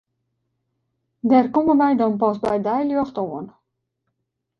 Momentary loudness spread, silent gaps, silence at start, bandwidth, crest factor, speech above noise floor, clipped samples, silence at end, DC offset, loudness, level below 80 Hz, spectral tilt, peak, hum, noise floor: 12 LU; none; 1.25 s; 6 kHz; 18 dB; 59 dB; under 0.1%; 1.1 s; under 0.1%; -20 LUFS; -60 dBFS; -8.5 dB/octave; -4 dBFS; none; -77 dBFS